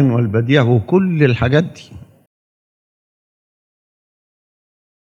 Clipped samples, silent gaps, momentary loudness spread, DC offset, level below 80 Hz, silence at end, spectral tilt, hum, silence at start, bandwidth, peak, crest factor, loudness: under 0.1%; none; 4 LU; under 0.1%; -52 dBFS; 3.2 s; -8.5 dB/octave; none; 0 s; 7.2 kHz; 0 dBFS; 18 dB; -15 LUFS